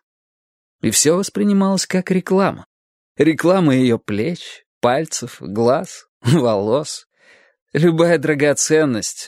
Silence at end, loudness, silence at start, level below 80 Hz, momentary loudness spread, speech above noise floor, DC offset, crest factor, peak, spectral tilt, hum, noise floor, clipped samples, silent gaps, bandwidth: 0 s; -17 LUFS; 0.85 s; -60 dBFS; 11 LU; 36 dB; under 0.1%; 18 dB; 0 dBFS; -5 dB/octave; none; -52 dBFS; under 0.1%; 2.66-3.15 s, 4.66-4.81 s, 6.08-6.20 s, 7.62-7.66 s; 16 kHz